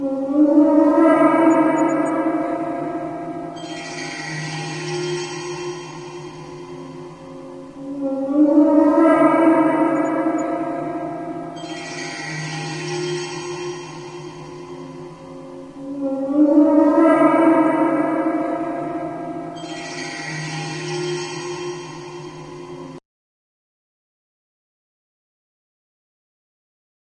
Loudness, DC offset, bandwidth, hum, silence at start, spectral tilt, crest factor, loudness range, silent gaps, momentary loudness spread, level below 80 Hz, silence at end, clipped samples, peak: -19 LUFS; under 0.1%; 10 kHz; none; 0 s; -5.5 dB/octave; 18 dB; 13 LU; none; 21 LU; -60 dBFS; 4 s; under 0.1%; -2 dBFS